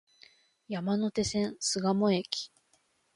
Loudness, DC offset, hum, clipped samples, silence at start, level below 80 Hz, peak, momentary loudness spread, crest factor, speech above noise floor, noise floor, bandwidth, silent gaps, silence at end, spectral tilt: -30 LUFS; under 0.1%; none; under 0.1%; 0.7 s; -62 dBFS; -12 dBFS; 9 LU; 20 dB; 41 dB; -71 dBFS; 11.5 kHz; none; 0.7 s; -4.5 dB/octave